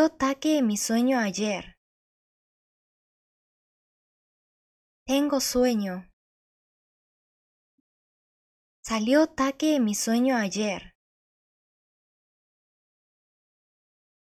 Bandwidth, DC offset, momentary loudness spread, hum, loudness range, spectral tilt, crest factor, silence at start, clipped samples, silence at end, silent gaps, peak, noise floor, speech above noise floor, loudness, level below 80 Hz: 14.5 kHz; under 0.1%; 11 LU; none; 11 LU; -4 dB/octave; 18 dB; 0 s; under 0.1%; 3.35 s; 1.77-5.06 s, 6.13-8.83 s; -10 dBFS; under -90 dBFS; over 66 dB; -25 LUFS; -60 dBFS